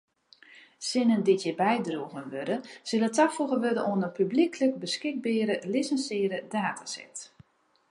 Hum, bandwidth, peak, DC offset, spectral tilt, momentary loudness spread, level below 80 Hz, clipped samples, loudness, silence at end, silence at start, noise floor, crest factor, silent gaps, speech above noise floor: none; 11.5 kHz; -12 dBFS; under 0.1%; -4.5 dB/octave; 11 LU; -80 dBFS; under 0.1%; -28 LUFS; 0.65 s; 0.55 s; -60 dBFS; 18 dB; none; 32 dB